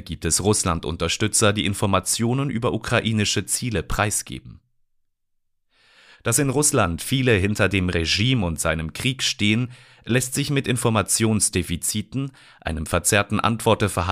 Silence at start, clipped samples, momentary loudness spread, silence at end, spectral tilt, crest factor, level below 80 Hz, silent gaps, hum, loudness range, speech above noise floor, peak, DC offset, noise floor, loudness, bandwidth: 0 s; under 0.1%; 7 LU; 0 s; -4 dB/octave; 18 dB; -42 dBFS; none; none; 4 LU; 49 dB; -4 dBFS; under 0.1%; -70 dBFS; -21 LUFS; 15.5 kHz